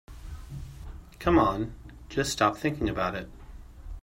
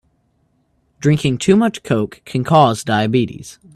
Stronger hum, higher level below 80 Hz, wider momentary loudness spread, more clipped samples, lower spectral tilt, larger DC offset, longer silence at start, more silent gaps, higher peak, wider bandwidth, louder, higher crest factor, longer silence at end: neither; first, -42 dBFS vs -50 dBFS; first, 23 LU vs 10 LU; neither; about the same, -5 dB/octave vs -6 dB/octave; neither; second, 0.1 s vs 1 s; neither; second, -10 dBFS vs 0 dBFS; first, 16 kHz vs 13 kHz; second, -28 LUFS vs -16 LUFS; about the same, 20 dB vs 16 dB; second, 0.05 s vs 0.25 s